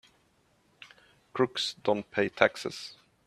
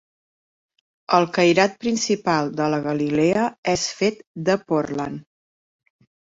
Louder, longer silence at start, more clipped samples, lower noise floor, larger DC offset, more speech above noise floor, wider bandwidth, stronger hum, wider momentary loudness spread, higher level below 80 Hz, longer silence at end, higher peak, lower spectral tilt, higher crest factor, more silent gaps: second, -29 LUFS vs -21 LUFS; second, 0.8 s vs 1.1 s; neither; second, -68 dBFS vs under -90 dBFS; neither; second, 39 dB vs over 69 dB; first, 13.5 kHz vs 8 kHz; neither; first, 16 LU vs 9 LU; second, -74 dBFS vs -58 dBFS; second, 0.35 s vs 1 s; about the same, -4 dBFS vs -2 dBFS; about the same, -4 dB/octave vs -4.5 dB/octave; first, 30 dB vs 20 dB; second, none vs 3.58-3.63 s, 4.27-4.34 s